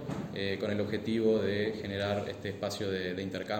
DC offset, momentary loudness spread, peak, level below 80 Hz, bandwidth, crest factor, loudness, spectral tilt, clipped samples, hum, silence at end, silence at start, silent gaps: under 0.1%; 8 LU; -16 dBFS; -64 dBFS; 16.5 kHz; 16 dB; -33 LUFS; -6 dB/octave; under 0.1%; none; 0 s; 0 s; none